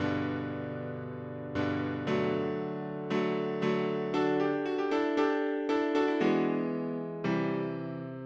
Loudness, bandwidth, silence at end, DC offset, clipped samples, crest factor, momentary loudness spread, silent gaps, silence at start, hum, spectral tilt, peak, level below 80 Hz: -31 LUFS; 7.6 kHz; 0 s; under 0.1%; under 0.1%; 16 dB; 9 LU; none; 0 s; none; -7.5 dB/octave; -16 dBFS; -70 dBFS